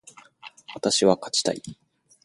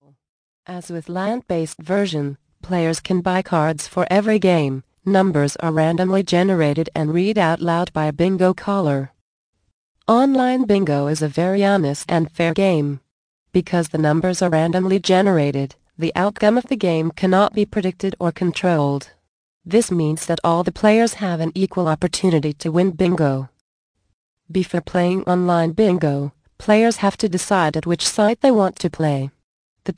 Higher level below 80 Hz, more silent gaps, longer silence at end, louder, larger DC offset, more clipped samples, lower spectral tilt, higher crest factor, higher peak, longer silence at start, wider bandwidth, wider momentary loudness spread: second, -64 dBFS vs -52 dBFS; second, none vs 9.21-9.53 s, 9.73-9.95 s, 13.11-13.46 s, 19.28-19.61 s, 23.61-23.94 s, 24.13-24.37 s, 29.44-29.76 s; first, 0.5 s vs 0.05 s; second, -23 LUFS vs -19 LUFS; neither; neither; second, -3 dB/octave vs -6 dB/octave; first, 22 dB vs 16 dB; about the same, -4 dBFS vs -2 dBFS; second, 0.45 s vs 0.7 s; about the same, 11.5 kHz vs 10.5 kHz; first, 24 LU vs 9 LU